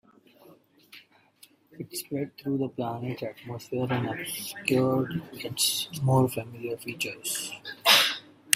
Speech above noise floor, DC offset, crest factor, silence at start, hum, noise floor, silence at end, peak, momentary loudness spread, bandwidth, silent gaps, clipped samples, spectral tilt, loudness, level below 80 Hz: 29 dB; under 0.1%; 28 dB; 0.45 s; none; -59 dBFS; 0 s; -2 dBFS; 16 LU; 16 kHz; none; under 0.1%; -3.5 dB/octave; -27 LUFS; -64 dBFS